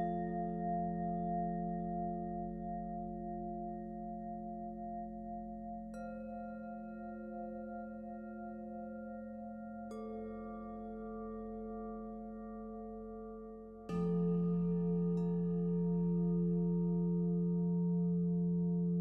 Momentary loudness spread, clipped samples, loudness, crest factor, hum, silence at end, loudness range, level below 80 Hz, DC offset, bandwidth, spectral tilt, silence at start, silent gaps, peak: 13 LU; under 0.1%; -39 LUFS; 12 dB; none; 0 s; 12 LU; -58 dBFS; under 0.1%; 2.8 kHz; -11.5 dB/octave; 0 s; none; -26 dBFS